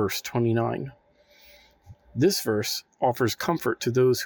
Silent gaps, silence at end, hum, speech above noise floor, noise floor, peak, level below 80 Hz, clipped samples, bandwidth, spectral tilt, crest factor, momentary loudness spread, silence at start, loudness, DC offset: none; 0 s; none; 32 dB; -57 dBFS; -8 dBFS; -62 dBFS; under 0.1%; 19.5 kHz; -5 dB/octave; 18 dB; 8 LU; 0 s; -25 LUFS; under 0.1%